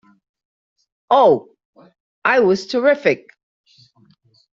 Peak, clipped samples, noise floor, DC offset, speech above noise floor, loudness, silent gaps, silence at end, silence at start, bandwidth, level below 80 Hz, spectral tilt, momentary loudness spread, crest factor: -2 dBFS; under 0.1%; -53 dBFS; under 0.1%; 38 dB; -16 LUFS; 1.65-1.73 s, 2.00-2.22 s; 1.4 s; 1.1 s; 7.6 kHz; -64 dBFS; -3 dB/octave; 8 LU; 18 dB